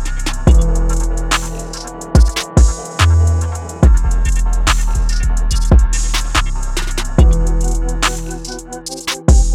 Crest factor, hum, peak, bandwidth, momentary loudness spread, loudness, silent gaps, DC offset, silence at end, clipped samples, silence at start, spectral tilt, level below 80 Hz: 12 dB; none; 0 dBFS; 14 kHz; 11 LU; -16 LUFS; none; under 0.1%; 0 s; under 0.1%; 0 s; -4.5 dB/octave; -14 dBFS